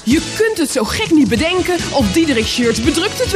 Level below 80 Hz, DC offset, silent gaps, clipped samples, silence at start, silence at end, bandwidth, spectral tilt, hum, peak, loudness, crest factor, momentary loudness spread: -34 dBFS; under 0.1%; none; under 0.1%; 0 s; 0 s; 15.5 kHz; -4 dB/octave; none; 0 dBFS; -15 LUFS; 14 dB; 4 LU